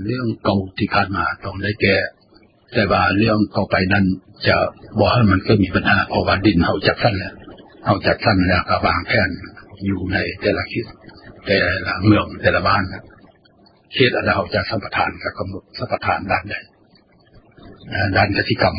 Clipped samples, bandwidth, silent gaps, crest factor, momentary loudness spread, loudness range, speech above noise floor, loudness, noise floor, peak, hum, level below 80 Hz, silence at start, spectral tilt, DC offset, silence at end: under 0.1%; 5.4 kHz; none; 18 dB; 11 LU; 5 LU; 35 dB; -18 LUFS; -53 dBFS; 0 dBFS; none; -36 dBFS; 0 s; -10 dB/octave; under 0.1%; 0 s